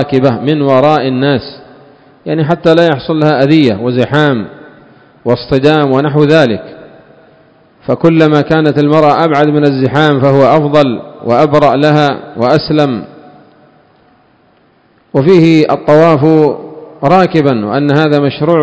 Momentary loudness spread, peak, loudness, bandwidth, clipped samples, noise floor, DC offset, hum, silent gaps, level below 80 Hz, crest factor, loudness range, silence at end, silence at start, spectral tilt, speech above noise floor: 9 LU; 0 dBFS; -9 LUFS; 8 kHz; 2%; -49 dBFS; under 0.1%; none; none; -46 dBFS; 10 dB; 4 LU; 0 s; 0 s; -8 dB/octave; 41 dB